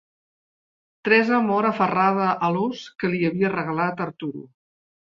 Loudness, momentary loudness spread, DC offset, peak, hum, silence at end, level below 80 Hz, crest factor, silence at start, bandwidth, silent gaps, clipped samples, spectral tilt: -22 LUFS; 12 LU; under 0.1%; -4 dBFS; none; 0.65 s; -66 dBFS; 20 dB; 1.05 s; 7.4 kHz; none; under 0.1%; -7.5 dB/octave